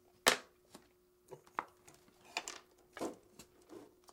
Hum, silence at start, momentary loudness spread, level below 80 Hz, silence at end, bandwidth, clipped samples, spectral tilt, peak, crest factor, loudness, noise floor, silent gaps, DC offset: none; 0.25 s; 28 LU; -76 dBFS; 0.25 s; 17.5 kHz; under 0.1%; -0.5 dB/octave; -12 dBFS; 30 dB; -39 LUFS; -69 dBFS; none; under 0.1%